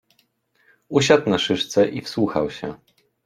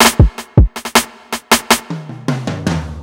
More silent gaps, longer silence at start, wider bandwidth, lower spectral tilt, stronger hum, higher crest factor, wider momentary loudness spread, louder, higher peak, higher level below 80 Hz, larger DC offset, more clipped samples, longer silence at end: neither; first, 0.9 s vs 0 s; second, 14 kHz vs over 20 kHz; about the same, -4.5 dB/octave vs -4 dB/octave; neither; first, 20 dB vs 14 dB; about the same, 11 LU vs 12 LU; second, -20 LUFS vs -15 LUFS; about the same, -2 dBFS vs 0 dBFS; second, -56 dBFS vs -20 dBFS; neither; neither; first, 0.5 s vs 0 s